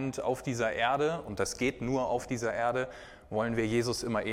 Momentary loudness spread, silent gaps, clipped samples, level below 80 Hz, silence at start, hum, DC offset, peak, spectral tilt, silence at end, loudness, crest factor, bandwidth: 6 LU; none; under 0.1%; -54 dBFS; 0 s; none; under 0.1%; -14 dBFS; -5 dB/octave; 0 s; -31 LUFS; 18 dB; 16.5 kHz